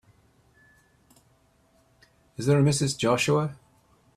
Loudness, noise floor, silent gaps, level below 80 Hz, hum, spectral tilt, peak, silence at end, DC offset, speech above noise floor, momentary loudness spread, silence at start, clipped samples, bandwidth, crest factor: -24 LUFS; -64 dBFS; none; -60 dBFS; none; -5.5 dB/octave; -10 dBFS; 0.65 s; under 0.1%; 40 dB; 11 LU; 2.4 s; under 0.1%; 14 kHz; 18 dB